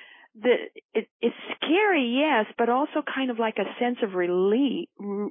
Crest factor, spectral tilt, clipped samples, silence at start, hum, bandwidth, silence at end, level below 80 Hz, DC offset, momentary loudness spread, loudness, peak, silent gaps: 14 dB; -9.5 dB/octave; under 0.1%; 0 s; none; 3.8 kHz; 0 s; -82 dBFS; under 0.1%; 9 LU; -25 LUFS; -10 dBFS; 0.85-0.89 s, 1.11-1.20 s